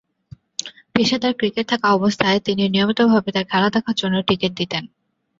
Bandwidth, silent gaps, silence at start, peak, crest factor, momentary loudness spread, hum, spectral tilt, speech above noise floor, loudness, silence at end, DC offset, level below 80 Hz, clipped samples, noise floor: 7.8 kHz; none; 0.65 s; -2 dBFS; 18 dB; 10 LU; none; -5 dB/octave; 27 dB; -19 LUFS; 0.55 s; under 0.1%; -56 dBFS; under 0.1%; -46 dBFS